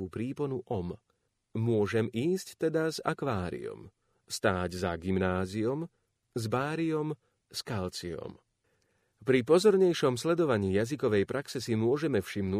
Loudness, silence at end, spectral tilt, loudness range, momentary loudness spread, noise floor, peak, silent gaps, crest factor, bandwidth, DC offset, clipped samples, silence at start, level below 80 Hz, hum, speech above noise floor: -30 LUFS; 0 s; -6 dB/octave; 7 LU; 15 LU; -74 dBFS; -12 dBFS; none; 20 dB; 15.5 kHz; under 0.1%; under 0.1%; 0 s; -62 dBFS; none; 45 dB